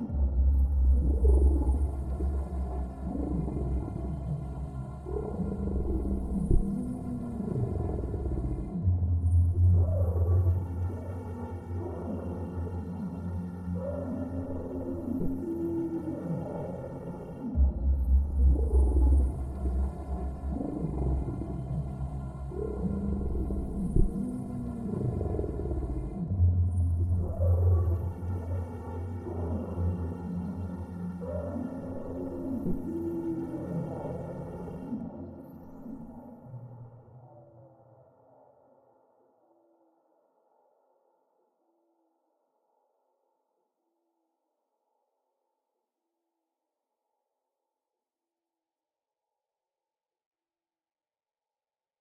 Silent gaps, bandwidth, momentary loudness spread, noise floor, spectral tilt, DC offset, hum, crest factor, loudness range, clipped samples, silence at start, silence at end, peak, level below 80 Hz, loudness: none; 2.3 kHz; 12 LU; under -90 dBFS; -11 dB/octave; under 0.1%; none; 20 dB; 8 LU; under 0.1%; 0 s; 14.35 s; -12 dBFS; -34 dBFS; -32 LUFS